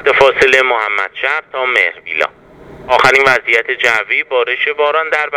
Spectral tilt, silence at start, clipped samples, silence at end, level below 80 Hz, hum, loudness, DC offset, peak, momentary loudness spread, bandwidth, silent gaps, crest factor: -2.5 dB/octave; 0 s; 0.2%; 0 s; -48 dBFS; none; -12 LUFS; under 0.1%; 0 dBFS; 8 LU; 17 kHz; none; 14 dB